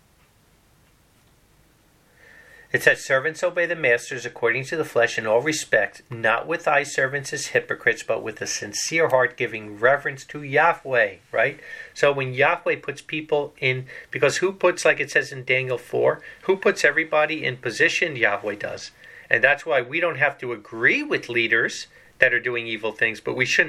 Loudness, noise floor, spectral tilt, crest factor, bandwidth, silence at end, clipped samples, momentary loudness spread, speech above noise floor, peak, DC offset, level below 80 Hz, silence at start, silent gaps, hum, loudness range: -22 LUFS; -58 dBFS; -3.5 dB/octave; 22 dB; 15 kHz; 0 s; under 0.1%; 9 LU; 36 dB; 0 dBFS; under 0.1%; -66 dBFS; 2.75 s; none; none; 2 LU